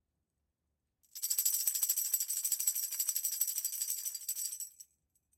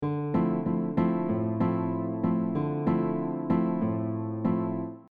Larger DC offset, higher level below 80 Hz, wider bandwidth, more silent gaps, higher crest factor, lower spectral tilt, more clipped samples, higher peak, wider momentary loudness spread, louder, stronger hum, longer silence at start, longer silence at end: neither; second, -86 dBFS vs -60 dBFS; first, 17 kHz vs 4.5 kHz; neither; first, 20 dB vs 14 dB; second, 5 dB/octave vs -12 dB/octave; neither; second, -18 dBFS vs -14 dBFS; first, 9 LU vs 4 LU; second, -32 LUFS vs -28 LUFS; neither; first, 1.15 s vs 0 s; first, 0.55 s vs 0.1 s